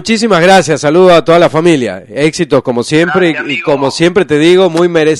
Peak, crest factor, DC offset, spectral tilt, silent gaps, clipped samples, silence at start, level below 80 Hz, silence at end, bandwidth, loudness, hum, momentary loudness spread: 0 dBFS; 8 dB; under 0.1%; -5 dB/octave; none; 1%; 0 s; -44 dBFS; 0 s; 12 kHz; -9 LUFS; none; 7 LU